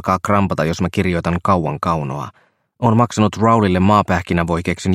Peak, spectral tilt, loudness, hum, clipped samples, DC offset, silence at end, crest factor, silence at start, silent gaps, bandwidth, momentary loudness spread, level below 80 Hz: 0 dBFS; -7 dB/octave; -17 LUFS; none; under 0.1%; under 0.1%; 0 s; 16 dB; 0.05 s; none; 13.5 kHz; 6 LU; -40 dBFS